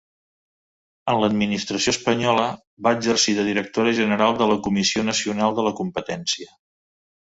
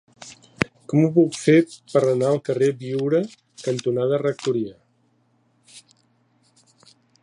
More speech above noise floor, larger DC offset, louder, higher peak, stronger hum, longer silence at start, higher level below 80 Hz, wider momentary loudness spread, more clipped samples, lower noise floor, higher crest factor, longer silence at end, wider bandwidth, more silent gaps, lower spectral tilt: first, over 69 dB vs 44 dB; neither; about the same, -21 LUFS vs -21 LUFS; about the same, -2 dBFS vs 0 dBFS; neither; first, 1.05 s vs 0.2 s; first, -56 dBFS vs -62 dBFS; second, 8 LU vs 15 LU; neither; first, under -90 dBFS vs -64 dBFS; about the same, 20 dB vs 22 dB; second, 0.95 s vs 1.45 s; second, 8 kHz vs 11 kHz; first, 2.67-2.77 s vs none; second, -3.5 dB/octave vs -6.5 dB/octave